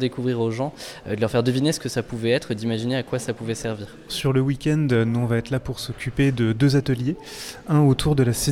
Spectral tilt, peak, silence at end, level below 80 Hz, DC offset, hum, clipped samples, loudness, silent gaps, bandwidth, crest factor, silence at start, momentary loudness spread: -6 dB/octave; -6 dBFS; 0 s; -44 dBFS; under 0.1%; none; under 0.1%; -23 LUFS; none; 16 kHz; 16 dB; 0 s; 11 LU